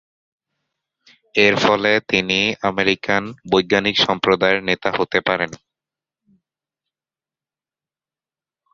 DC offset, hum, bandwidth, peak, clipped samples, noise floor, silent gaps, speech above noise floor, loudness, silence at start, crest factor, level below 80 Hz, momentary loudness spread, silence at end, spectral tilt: under 0.1%; none; 7.6 kHz; 0 dBFS; under 0.1%; under -90 dBFS; none; over 72 dB; -17 LUFS; 1.35 s; 20 dB; -54 dBFS; 6 LU; 3.2 s; -4 dB/octave